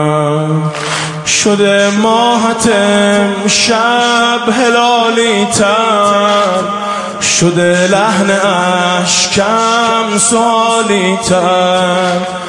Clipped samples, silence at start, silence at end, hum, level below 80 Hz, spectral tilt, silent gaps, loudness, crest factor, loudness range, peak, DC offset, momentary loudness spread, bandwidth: under 0.1%; 0 s; 0 s; none; -48 dBFS; -3.5 dB/octave; none; -10 LUFS; 10 dB; 1 LU; 0 dBFS; under 0.1%; 4 LU; 11.5 kHz